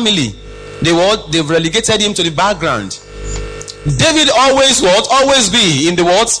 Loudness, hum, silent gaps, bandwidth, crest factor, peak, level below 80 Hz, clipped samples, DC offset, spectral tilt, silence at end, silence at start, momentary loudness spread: -11 LUFS; none; none; 10.5 kHz; 10 dB; -2 dBFS; -32 dBFS; under 0.1%; under 0.1%; -3 dB/octave; 0 s; 0 s; 16 LU